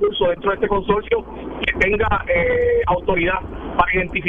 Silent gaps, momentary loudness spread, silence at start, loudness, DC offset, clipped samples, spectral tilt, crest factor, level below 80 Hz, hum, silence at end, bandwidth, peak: none; 6 LU; 0 s; -19 LUFS; under 0.1%; under 0.1%; -7 dB/octave; 18 dB; -32 dBFS; none; 0 s; 7.4 kHz; -2 dBFS